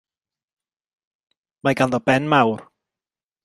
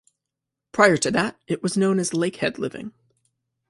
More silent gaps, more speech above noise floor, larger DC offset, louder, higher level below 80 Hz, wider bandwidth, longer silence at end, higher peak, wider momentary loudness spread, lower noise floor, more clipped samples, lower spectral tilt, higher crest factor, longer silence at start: neither; first, over 72 dB vs 63 dB; neither; first, -19 LUFS vs -22 LUFS; about the same, -60 dBFS vs -62 dBFS; about the same, 12.5 kHz vs 11.5 kHz; about the same, 0.8 s vs 0.8 s; about the same, -2 dBFS vs -2 dBFS; second, 8 LU vs 14 LU; first, under -90 dBFS vs -85 dBFS; neither; first, -6 dB/octave vs -4.5 dB/octave; about the same, 22 dB vs 22 dB; first, 1.65 s vs 0.75 s